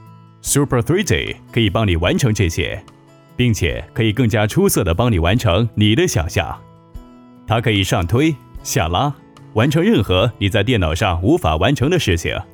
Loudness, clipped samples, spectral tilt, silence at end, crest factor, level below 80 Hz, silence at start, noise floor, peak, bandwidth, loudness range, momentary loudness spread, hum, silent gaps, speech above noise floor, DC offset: -17 LUFS; under 0.1%; -5 dB/octave; 0.1 s; 14 dB; -32 dBFS; 0.45 s; -41 dBFS; -4 dBFS; over 20 kHz; 2 LU; 7 LU; none; none; 25 dB; under 0.1%